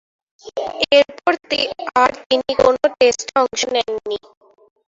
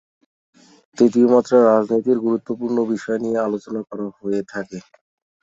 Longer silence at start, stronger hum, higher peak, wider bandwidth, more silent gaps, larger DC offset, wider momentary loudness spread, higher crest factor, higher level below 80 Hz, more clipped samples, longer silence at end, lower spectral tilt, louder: second, 0.45 s vs 0.95 s; neither; about the same, 0 dBFS vs -2 dBFS; about the same, 7.8 kHz vs 7.8 kHz; first, 2.26-2.30 s vs none; neither; second, 12 LU vs 16 LU; about the same, 18 dB vs 18 dB; first, -54 dBFS vs -66 dBFS; neither; about the same, 0.7 s vs 0.6 s; second, -2 dB/octave vs -7 dB/octave; about the same, -17 LUFS vs -19 LUFS